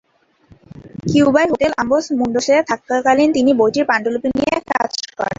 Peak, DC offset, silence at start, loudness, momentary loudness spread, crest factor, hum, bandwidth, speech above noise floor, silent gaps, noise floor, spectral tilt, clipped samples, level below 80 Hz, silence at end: -2 dBFS; under 0.1%; 0.75 s; -16 LUFS; 6 LU; 14 dB; none; 7.8 kHz; 36 dB; none; -51 dBFS; -5 dB/octave; under 0.1%; -50 dBFS; 0.05 s